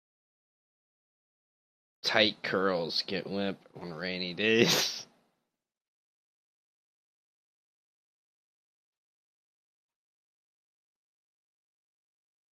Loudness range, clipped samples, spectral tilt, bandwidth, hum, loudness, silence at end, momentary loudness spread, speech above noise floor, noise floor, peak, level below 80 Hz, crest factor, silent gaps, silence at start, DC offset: 3 LU; under 0.1%; -3 dB/octave; 14 kHz; none; -29 LUFS; 7.45 s; 13 LU; 56 dB; -86 dBFS; -8 dBFS; -76 dBFS; 28 dB; none; 2.05 s; under 0.1%